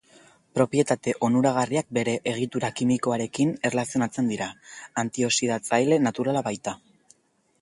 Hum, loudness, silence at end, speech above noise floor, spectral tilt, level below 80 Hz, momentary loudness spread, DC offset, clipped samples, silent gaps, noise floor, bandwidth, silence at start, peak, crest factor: none; -25 LUFS; 0.85 s; 42 dB; -5 dB/octave; -64 dBFS; 10 LU; under 0.1%; under 0.1%; none; -66 dBFS; 11.5 kHz; 0.55 s; -6 dBFS; 18 dB